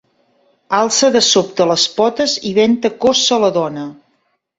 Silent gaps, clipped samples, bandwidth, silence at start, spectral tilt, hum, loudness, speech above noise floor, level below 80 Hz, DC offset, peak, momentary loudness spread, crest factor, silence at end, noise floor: none; under 0.1%; 8.2 kHz; 0.7 s; -2.5 dB/octave; none; -14 LUFS; 50 dB; -58 dBFS; under 0.1%; 0 dBFS; 8 LU; 14 dB; 0.65 s; -64 dBFS